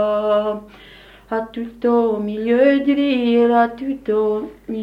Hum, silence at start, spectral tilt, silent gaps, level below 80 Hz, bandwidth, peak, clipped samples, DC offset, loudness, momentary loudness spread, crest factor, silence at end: 50 Hz at -50 dBFS; 0 s; -7.5 dB/octave; none; -52 dBFS; 5.4 kHz; -2 dBFS; under 0.1%; under 0.1%; -18 LUFS; 11 LU; 16 dB; 0 s